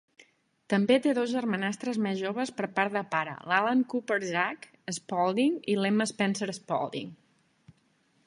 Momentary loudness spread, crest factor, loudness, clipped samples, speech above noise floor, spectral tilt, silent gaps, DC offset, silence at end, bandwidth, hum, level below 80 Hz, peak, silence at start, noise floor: 9 LU; 20 dB; -29 LUFS; under 0.1%; 40 dB; -5 dB/octave; none; under 0.1%; 1.15 s; 11.5 kHz; none; -76 dBFS; -8 dBFS; 0.7 s; -69 dBFS